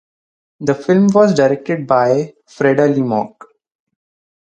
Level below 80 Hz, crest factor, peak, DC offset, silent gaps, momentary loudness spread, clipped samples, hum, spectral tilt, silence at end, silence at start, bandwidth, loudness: -60 dBFS; 16 dB; 0 dBFS; under 0.1%; none; 10 LU; under 0.1%; none; -7 dB/octave; 1.3 s; 0.6 s; 8.8 kHz; -14 LUFS